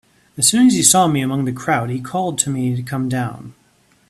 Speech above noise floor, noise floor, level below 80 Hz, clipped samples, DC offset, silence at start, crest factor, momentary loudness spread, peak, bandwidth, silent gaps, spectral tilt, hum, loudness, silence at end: 39 dB; -56 dBFS; -56 dBFS; under 0.1%; under 0.1%; 0.35 s; 18 dB; 11 LU; 0 dBFS; 15.5 kHz; none; -3.5 dB/octave; none; -16 LUFS; 0.6 s